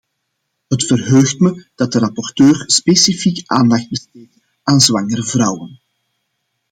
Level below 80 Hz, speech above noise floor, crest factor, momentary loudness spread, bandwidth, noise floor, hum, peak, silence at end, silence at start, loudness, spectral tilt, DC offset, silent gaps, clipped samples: -54 dBFS; 58 dB; 16 dB; 10 LU; 16.5 kHz; -72 dBFS; none; 0 dBFS; 0.95 s; 0.7 s; -13 LUFS; -4 dB/octave; under 0.1%; none; under 0.1%